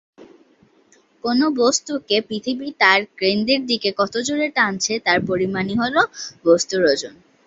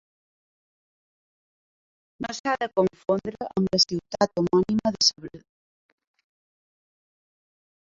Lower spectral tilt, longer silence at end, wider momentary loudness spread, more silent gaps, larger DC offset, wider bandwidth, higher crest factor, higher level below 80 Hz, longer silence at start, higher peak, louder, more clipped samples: about the same, -3 dB/octave vs -4 dB/octave; second, 0.35 s vs 2.45 s; second, 7 LU vs 12 LU; second, none vs 2.40-2.44 s; neither; about the same, 8.2 kHz vs 7.6 kHz; about the same, 18 dB vs 22 dB; about the same, -58 dBFS vs -62 dBFS; second, 0.2 s vs 2.2 s; first, -2 dBFS vs -6 dBFS; first, -19 LUFS vs -24 LUFS; neither